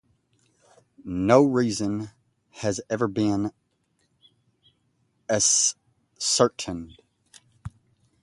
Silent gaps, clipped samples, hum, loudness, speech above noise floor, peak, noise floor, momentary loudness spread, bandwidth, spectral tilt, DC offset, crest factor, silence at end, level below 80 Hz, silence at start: none; under 0.1%; none; -23 LUFS; 48 dB; -2 dBFS; -71 dBFS; 25 LU; 11.5 kHz; -3.5 dB/octave; under 0.1%; 24 dB; 0.55 s; -56 dBFS; 1.05 s